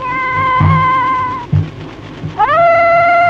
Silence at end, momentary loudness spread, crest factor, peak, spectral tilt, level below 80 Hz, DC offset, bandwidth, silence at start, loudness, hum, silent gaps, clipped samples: 0 s; 16 LU; 12 dB; 0 dBFS; -8 dB/octave; -38 dBFS; under 0.1%; 7.4 kHz; 0 s; -11 LUFS; none; none; under 0.1%